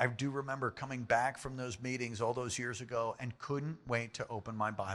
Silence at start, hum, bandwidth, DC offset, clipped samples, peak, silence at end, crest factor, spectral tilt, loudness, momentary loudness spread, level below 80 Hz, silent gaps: 0 s; none; 12.5 kHz; under 0.1%; under 0.1%; -16 dBFS; 0 s; 22 dB; -5 dB/octave; -38 LUFS; 9 LU; -66 dBFS; none